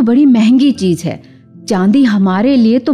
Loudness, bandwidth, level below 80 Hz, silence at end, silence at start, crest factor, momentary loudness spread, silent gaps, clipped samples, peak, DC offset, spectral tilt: -11 LUFS; 11.5 kHz; -52 dBFS; 0 s; 0 s; 8 dB; 13 LU; none; under 0.1%; -2 dBFS; under 0.1%; -7 dB/octave